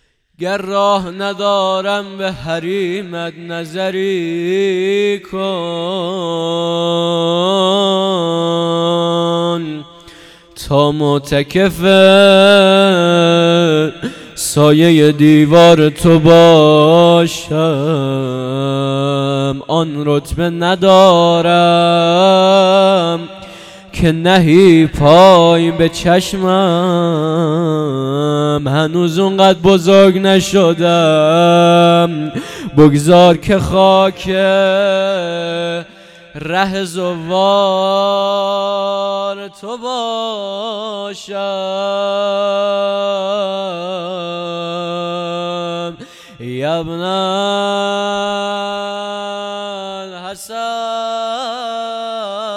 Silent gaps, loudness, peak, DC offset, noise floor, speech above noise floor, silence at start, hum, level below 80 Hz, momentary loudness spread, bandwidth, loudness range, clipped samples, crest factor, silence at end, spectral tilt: none; -12 LUFS; 0 dBFS; under 0.1%; -39 dBFS; 28 dB; 0.4 s; none; -42 dBFS; 15 LU; 15 kHz; 10 LU; 0.4%; 12 dB; 0 s; -5.5 dB/octave